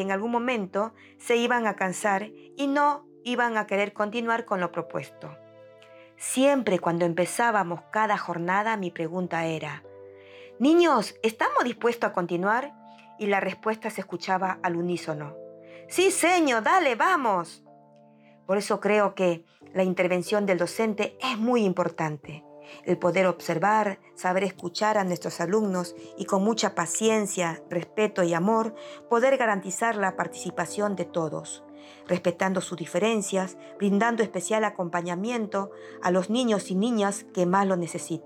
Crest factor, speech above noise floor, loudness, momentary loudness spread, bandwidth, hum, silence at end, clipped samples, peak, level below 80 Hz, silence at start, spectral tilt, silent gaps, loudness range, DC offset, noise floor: 18 dB; 29 dB; -26 LUFS; 11 LU; 18.5 kHz; none; 0 s; under 0.1%; -8 dBFS; -80 dBFS; 0 s; -4.5 dB/octave; none; 3 LU; under 0.1%; -55 dBFS